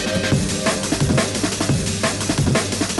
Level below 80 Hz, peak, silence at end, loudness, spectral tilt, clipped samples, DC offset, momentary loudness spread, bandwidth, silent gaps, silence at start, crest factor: -36 dBFS; -4 dBFS; 0 s; -19 LUFS; -4 dB/octave; under 0.1%; under 0.1%; 2 LU; 12 kHz; none; 0 s; 16 dB